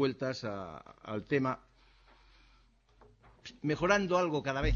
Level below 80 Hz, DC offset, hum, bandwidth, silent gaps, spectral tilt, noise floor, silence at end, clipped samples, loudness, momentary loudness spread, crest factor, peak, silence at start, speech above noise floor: -48 dBFS; under 0.1%; none; 7.4 kHz; none; -6 dB/octave; -65 dBFS; 0 s; under 0.1%; -33 LUFS; 19 LU; 22 dB; -12 dBFS; 0 s; 33 dB